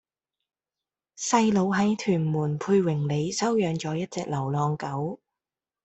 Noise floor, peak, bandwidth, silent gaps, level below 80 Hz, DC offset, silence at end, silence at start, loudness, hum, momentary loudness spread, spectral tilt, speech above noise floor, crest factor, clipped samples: under -90 dBFS; -8 dBFS; 8.2 kHz; none; -64 dBFS; under 0.1%; 0.7 s; 1.2 s; -26 LUFS; none; 8 LU; -6 dB/octave; over 65 dB; 20 dB; under 0.1%